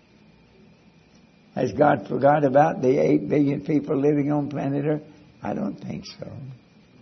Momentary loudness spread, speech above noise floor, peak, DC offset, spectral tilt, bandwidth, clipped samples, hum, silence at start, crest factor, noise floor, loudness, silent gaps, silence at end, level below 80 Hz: 17 LU; 33 dB; -4 dBFS; under 0.1%; -8.5 dB/octave; 6.4 kHz; under 0.1%; none; 1.55 s; 20 dB; -54 dBFS; -22 LUFS; none; 0.45 s; -62 dBFS